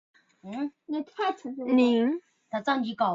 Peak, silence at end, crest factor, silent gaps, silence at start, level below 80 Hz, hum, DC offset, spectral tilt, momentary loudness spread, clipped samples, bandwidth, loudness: -12 dBFS; 0 s; 16 dB; none; 0.45 s; -74 dBFS; none; under 0.1%; -6 dB/octave; 13 LU; under 0.1%; 7.4 kHz; -28 LUFS